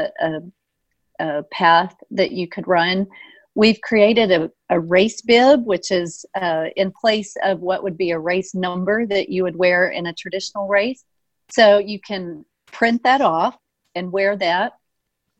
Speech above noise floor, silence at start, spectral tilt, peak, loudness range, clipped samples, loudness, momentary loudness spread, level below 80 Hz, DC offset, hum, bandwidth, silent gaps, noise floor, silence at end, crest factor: 58 dB; 0 s; -5 dB/octave; 0 dBFS; 4 LU; under 0.1%; -18 LUFS; 13 LU; -60 dBFS; under 0.1%; none; 8.6 kHz; none; -76 dBFS; 0.7 s; 18 dB